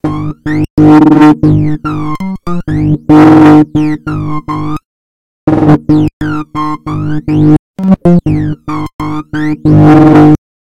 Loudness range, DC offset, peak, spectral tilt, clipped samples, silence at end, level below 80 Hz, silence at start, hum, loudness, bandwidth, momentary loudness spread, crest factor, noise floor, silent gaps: 6 LU; 4%; 0 dBFS; -9 dB/octave; 5%; 0.3 s; -30 dBFS; 0 s; none; -8 LUFS; 7 kHz; 14 LU; 8 dB; under -90 dBFS; 0.70-0.77 s, 4.85-5.47 s, 6.13-6.20 s, 7.59-7.74 s, 8.94-8.99 s